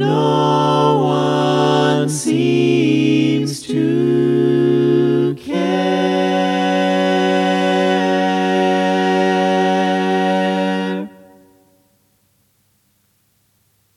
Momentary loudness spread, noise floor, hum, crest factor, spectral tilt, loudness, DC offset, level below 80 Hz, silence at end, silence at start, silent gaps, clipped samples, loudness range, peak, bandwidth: 4 LU; -61 dBFS; none; 14 dB; -6 dB/octave; -16 LUFS; under 0.1%; -66 dBFS; 2.9 s; 0 s; none; under 0.1%; 6 LU; -2 dBFS; 13 kHz